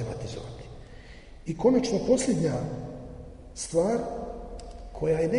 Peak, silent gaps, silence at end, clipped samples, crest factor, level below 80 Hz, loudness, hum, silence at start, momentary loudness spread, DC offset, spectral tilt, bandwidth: -10 dBFS; none; 0 s; under 0.1%; 18 dB; -46 dBFS; -28 LUFS; none; 0 s; 22 LU; under 0.1%; -6 dB/octave; 10.5 kHz